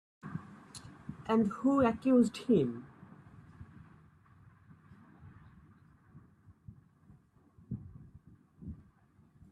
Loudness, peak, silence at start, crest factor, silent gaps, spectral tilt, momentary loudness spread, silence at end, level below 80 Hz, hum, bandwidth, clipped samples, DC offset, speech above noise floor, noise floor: -32 LUFS; -16 dBFS; 0.25 s; 20 dB; none; -7.5 dB/octave; 28 LU; 0.8 s; -66 dBFS; none; 11.5 kHz; under 0.1%; under 0.1%; 36 dB; -65 dBFS